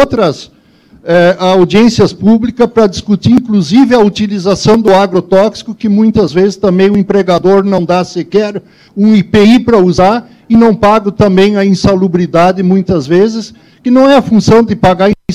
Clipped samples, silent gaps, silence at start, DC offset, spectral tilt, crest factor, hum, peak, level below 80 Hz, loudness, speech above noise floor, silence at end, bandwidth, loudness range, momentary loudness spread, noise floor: under 0.1%; none; 0 s; 0.7%; -6.5 dB/octave; 8 dB; none; 0 dBFS; -36 dBFS; -8 LUFS; 35 dB; 0 s; 10.5 kHz; 2 LU; 7 LU; -43 dBFS